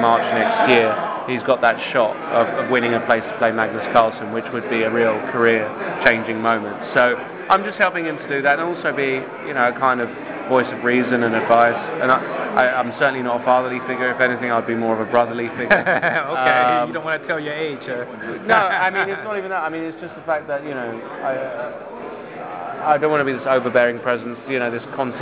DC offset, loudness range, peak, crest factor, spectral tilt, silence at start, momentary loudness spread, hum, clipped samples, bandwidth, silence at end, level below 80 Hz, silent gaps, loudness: under 0.1%; 4 LU; -2 dBFS; 16 dB; -8.5 dB/octave; 0 s; 10 LU; none; under 0.1%; 4 kHz; 0 s; -60 dBFS; none; -19 LUFS